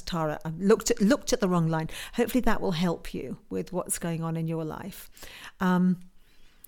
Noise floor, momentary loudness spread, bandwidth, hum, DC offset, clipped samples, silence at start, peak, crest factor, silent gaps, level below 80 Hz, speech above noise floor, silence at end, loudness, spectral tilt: -52 dBFS; 14 LU; 19 kHz; none; under 0.1%; under 0.1%; 0 s; -8 dBFS; 20 dB; none; -44 dBFS; 25 dB; 0.25 s; -28 LUFS; -5.5 dB/octave